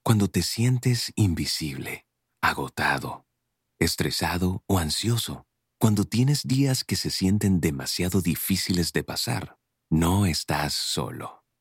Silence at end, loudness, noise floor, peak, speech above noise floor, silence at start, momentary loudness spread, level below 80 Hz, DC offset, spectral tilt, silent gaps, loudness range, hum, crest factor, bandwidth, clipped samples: 0.25 s; -25 LUFS; -79 dBFS; -8 dBFS; 54 dB; 0.05 s; 10 LU; -46 dBFS; under 0.1%; -4.5 dB/octave; none; 3 LU; none; 18 dB; 17 kHz; under 0.1%